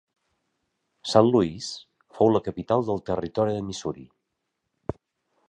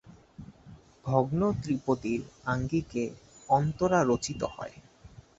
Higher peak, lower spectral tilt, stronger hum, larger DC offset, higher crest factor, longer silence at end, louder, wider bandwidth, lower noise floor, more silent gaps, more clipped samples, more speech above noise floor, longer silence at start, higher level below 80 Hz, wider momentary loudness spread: first, -4 dBFS vs -10 dBFS; about the same, -6.5 dB/octave vs -6.5 dB/octave; neither; neither; about the same, 24 dB vs 20 dB; first, 0.55 s vs 0.3 s; first, -24 LUFS vs -29 LUFS; first, 10.5 kHz vs 8 kHz; first, -80 dBFS vs -53 dBFS; neither; neither; first, 56 dB vs 25 dB; first, 1.05 s vs 0.05 s; about the same, -54 dBFS vs -54 dBFS; second, 17 LU vs 22 LU